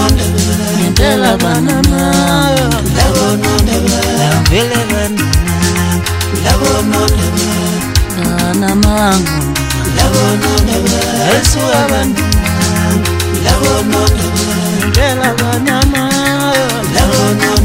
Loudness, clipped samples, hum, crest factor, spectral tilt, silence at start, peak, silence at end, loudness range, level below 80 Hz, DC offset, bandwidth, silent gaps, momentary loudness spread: -11 LUFS; under 0.1%; none; 10 dB; -4.5 dB/octave; 0 s; 0 dBFS; 0 s; 1 LU; -20 dBFS; under 0.1%; 16.5 kHz; none; 3 LU